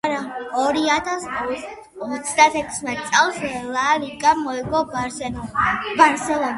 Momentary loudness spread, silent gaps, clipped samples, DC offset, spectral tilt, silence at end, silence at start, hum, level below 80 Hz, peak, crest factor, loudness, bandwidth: 11 LU; none; under 0.1%; under 0.1%; -3 dB/octave; 0 s; 0.05 s; none; -50 dBFS; 0 dBFS; 20 dB; -20 LUFS; 11.5 kHz